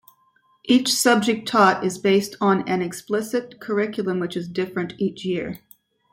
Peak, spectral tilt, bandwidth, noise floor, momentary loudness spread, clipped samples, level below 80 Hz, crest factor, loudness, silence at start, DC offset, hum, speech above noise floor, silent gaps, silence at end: -4 dBFS; -4 dB/octave; 16.5 kHz; -62 dBFS; 10 LU; under 0.1%; -64 dBFS; 20 dB; -21 LUFS; 0.65 s; under 0.1%; none; 41 dB; none; 0.55 s